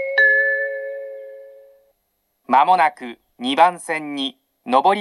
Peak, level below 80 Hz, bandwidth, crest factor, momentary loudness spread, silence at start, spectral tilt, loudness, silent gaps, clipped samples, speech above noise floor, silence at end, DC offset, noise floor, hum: 0 dBFS; -78 dBFS; 12.5 kHz; 18 dB; 22 LU; 0 s; -3 dB/octave; -18 LUFS; none; under 0.1%; 53 dB; 0 s; under 0.1%; -71 dBFS; none